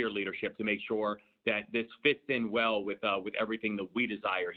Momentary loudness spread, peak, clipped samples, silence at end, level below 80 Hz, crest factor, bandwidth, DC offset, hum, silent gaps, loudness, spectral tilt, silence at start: 5 LU; -14 dBFS; under 0.1%; 0 s; -72 dBFS; 20 dB; 4.7 kHz; under 0.1%; none; none; -32 LUFS; -7 dB/octave; 0 s